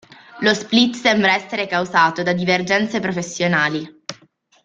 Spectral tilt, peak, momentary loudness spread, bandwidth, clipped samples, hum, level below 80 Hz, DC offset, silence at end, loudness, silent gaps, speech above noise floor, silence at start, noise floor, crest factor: -4 dB/octave; -2 dBFS; 9 LU; 9.2 kHz; under 0.1%; none; -58 dBFS; under 0.1%; 0.5 s; -18 LUFS; none; 36 dB; 0.3 s; -54 dBFS; 18 dB